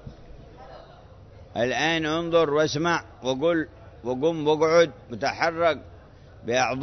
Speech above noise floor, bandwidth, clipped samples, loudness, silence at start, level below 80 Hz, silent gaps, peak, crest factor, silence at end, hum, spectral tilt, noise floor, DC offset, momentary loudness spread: 24 dB; 6.4 kHz; under 0.1%; -24 LUFS; 0.05 s; -52 dBFS; none; -8 dBFS; 18 dB; 0 s; none; -4.5 dB/octave; -48 dBFS; under 0.1%; 16 LU